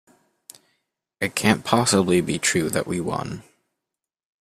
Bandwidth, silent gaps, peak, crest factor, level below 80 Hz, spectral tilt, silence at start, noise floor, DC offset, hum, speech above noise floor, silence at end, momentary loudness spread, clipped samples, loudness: 15.5 kHz; none; -2 dBFS; 22 dB; -56 dBFS; -4 dB/octave; 1.2 s; -86 dBFS; under 0.1%; none; 64 dB; 1 s; 11 LU; under 0.1%; -21 LUFS